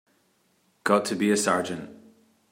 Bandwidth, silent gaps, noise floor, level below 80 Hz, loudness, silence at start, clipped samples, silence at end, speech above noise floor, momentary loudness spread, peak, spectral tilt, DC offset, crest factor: 16 kHz; none; -67 dBFS; -74 dBFS; -25 LUFS; 0.85 s; under 0.1%; 0.55 s; 43 dB; 14 LU; -6 dBFS; -4 dB/octave; under 0.1%; 22 dB